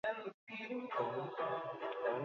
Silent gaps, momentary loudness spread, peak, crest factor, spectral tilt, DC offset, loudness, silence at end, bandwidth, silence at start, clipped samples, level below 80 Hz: 0.34-0.47 s; 7 LU; -26 dBFS; 16 dB; -3.5 dB/octave; under 0.1%; -42 LUFS; 0 s; 7 kHz; 0.05 s; under 0.1%; -86 dBFS